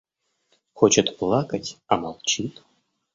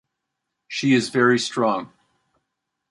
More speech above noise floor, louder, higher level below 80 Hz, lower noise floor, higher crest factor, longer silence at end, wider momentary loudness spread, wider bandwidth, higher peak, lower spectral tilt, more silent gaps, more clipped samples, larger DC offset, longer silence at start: second, 47 dB vs 61 dB; about the same, -22 LUFS vs -21 LUFS; first, -58 dBFS vs -68 dBFS; second, -70 dBFS vs -80 dBFS; about the same, 22 dB vs 20 dB; second, 0.65 s vs 1.05 s; about the same, 12 LU vs 10 LU; second, 7.8 kHz vs 11.5 kHz; about the same, -2 dBFS vs -4 dBFS; about the same, -3.5 dB/octave vs -4.5 dB/octave; neither; neither; neither; about the same, 0.75 s vs 0.7 s